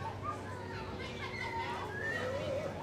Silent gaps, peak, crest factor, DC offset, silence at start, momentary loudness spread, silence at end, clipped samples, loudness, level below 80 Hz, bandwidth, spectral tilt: none; -26 dBFS; 14 dB; under 0.1%; 0 s; 6 LU; 0 s; under 0.1%; -39 LUFS; -58 dBFS; 15 kHz; -5.5 dB/octave